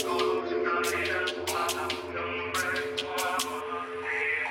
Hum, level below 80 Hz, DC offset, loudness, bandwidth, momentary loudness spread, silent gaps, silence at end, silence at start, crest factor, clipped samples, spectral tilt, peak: none; -62 dBFS; under 0.1%; -29 LUFS; 17 kHz; 5 LU; none; 0 s; 0 s; 16 dB; under 0.1%; -2.5 dB/octave; -14 dBFS